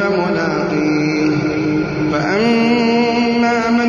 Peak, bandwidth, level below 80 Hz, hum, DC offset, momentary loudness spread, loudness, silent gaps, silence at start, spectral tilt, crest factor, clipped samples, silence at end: -4 dBFS; 7.2 kHz; -46 dBFS; none; under 0.1%; 4 LU; -15 LUFS; none; 0 s; -6 dB/octave; 12 dB; under 0.1%; 0 s